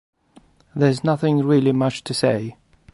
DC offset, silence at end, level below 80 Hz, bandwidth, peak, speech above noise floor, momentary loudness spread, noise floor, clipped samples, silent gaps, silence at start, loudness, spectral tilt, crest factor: under 0.1%; 0.45 s; -58 dBFS; 11.5 kHz; -4 dBFS; 35 dB; 9 LU; -53 dBFS; under 0.1%; none; 0.75 s; -20 LUFS; -6.5 dB/octave; 16 dB